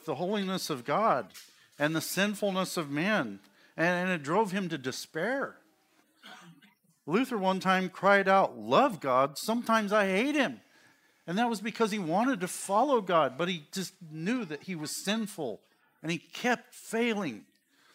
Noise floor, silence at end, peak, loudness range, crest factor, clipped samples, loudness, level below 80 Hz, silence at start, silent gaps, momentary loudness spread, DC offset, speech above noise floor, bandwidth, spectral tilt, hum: -68 dBFS; 0.5 s; -8 dBFS; 7 LU; 22 dB; under 0.1%; -30 LUFS; -82 dBFS; 0.05 s; none; 12 LU; under 0.1%; 38 dB; 16 kHz; -4.5 dB/octave; none